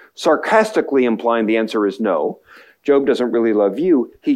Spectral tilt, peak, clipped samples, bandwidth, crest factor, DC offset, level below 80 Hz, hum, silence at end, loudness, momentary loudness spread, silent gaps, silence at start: -5.5 dB/octave; -2 dBFS; under 0.1%; 13 kHz; 16 dB; under 0.1%; -64 dBFS; none; 0 s; -17 LUFS; 4 LU; none; 0.2 s